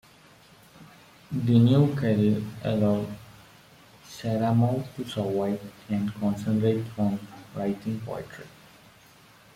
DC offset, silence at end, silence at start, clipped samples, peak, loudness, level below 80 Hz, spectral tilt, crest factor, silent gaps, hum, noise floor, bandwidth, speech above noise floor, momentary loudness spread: under 0.1%; 1.05 s; 0.8 s; under 0.1%; -8 dBFS; -26 LUFS; -60 dBFS; -8 dB/octave; 18 dB; none; none; -54 dBFS; 15.5 kHz; 29 dB; 16 LU